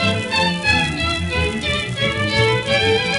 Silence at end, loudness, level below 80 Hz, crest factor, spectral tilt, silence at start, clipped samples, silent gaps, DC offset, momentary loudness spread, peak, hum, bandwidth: 0 s; -18 LUFS; -34 dBFS; 14 dB; -4.5 dB/octave; 0 s; under 0.1%; none; under 0.1%; 4 LU; -4 dBFS; none; 11.5 kHz